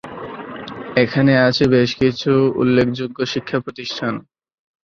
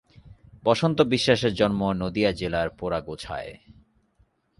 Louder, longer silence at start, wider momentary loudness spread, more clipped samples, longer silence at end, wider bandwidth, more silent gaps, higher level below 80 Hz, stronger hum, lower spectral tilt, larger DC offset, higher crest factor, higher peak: first, -17 LUFS vs -24 LUFS; second, 0.05 s vs 0.25 s; first, 17 LU vs 13 LU; neither; second, 0.65 s vs 1.05 s; second, 7.2 kHz vs 11.5 kHz; neither; about the same, -50 dBFS vs -48 dBFS; neither; about the same, -6.5 dB/octave vs -5.5 dB/octave; neither; about the same, 16 dB vs 20 dB; about the same, -2 dBFS vs -4 dBFS